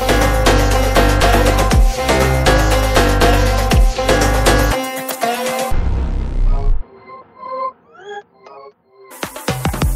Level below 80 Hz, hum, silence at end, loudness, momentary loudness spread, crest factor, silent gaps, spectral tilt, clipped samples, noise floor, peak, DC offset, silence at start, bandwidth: -18 dBFS; none; 0 s; -15 LUFS; 15 LU; 14 dB; none; -4.5 dB/octave; under 0.1%; -42 dBFS; 0 dBFS; under 0.1%; 0 s; 16.5 kHz